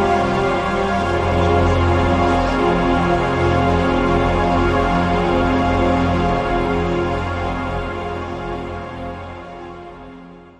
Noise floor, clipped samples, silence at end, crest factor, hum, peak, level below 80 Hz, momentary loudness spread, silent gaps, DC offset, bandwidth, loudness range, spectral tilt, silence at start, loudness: -39 dBFS; under 0.1%; 0.1 s; 16 dB; none; -2 dBFS; -30 dBFS; 14 LU; none; under 0.1%; 9.8 kHz; 8 LU; -7 dB/octave; 0 s; -18 LUFS